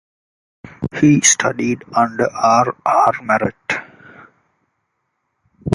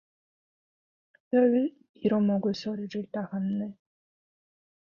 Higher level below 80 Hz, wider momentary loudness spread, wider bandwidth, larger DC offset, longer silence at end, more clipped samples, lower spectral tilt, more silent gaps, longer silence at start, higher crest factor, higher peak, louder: first, -50 dBFS vs -72 dBFS; about the same, 12 LU vs 11 LU; first, 11.5 kHz vs 7 kHz; neither; second, 0 s vs 1.1 s; neither; second, -4 dB/octave vs -8 dB/octave; second, none vs 1.89-1.94 s; second, 0.65 s vs 1.3 s; about the same, 18 dB vs 16 dB; first, 0 dBFS vs -14 dBFS; first, -16 LUFS vs -28 LUFS